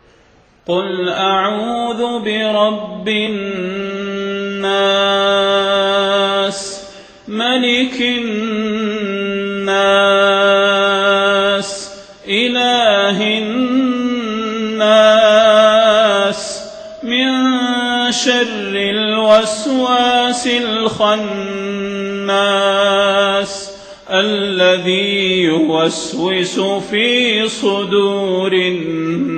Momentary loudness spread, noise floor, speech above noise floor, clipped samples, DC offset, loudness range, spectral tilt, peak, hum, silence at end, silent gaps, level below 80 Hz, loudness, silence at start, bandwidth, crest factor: 10 LU; -49 dBFS; 35 dB; under 0.1%; under 0.1%; 5 LU; -3.5 dB/octave; 0 dBFS; none; 0 s; none; -54 dBFS; -14 LUFS; 0.7 s; 9 kHz; 14 dB